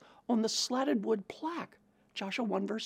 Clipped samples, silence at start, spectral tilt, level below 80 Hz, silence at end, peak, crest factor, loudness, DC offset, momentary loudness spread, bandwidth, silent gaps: under 0.1%; 0.3 s; -3.5 dB/octave; -82 dBFS; 0 s; -18 dBFS; 16 dB; -34 LUFS; under 0.1%; 11 LU; 16 kHz; none